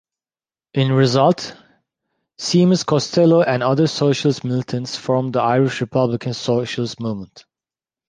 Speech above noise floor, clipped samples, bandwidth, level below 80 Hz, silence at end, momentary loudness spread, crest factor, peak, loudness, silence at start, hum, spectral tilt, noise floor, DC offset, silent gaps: over 73 dB; under 0.1%; 9.8 kHz; -58 dBFS; 0.7 s; 10 LU; 16 dB; -2 dBFS; -18 LUFS; 0.75 s; none; -6 dB/octave; under -90 dBFS; under 0.1%; none